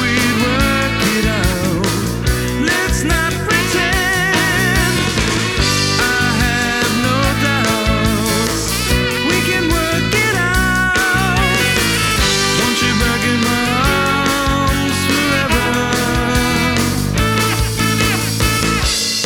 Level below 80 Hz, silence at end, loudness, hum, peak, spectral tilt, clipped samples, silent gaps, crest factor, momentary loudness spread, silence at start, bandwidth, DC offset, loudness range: -26 dBFS; 0 s; -14 LUFS; none; -2 dBFS; -3.5 dB/octave; under 0.1%; none; 14 dB; 3 LU; 0 s; 19 kHz; under 0.1%; 2 LU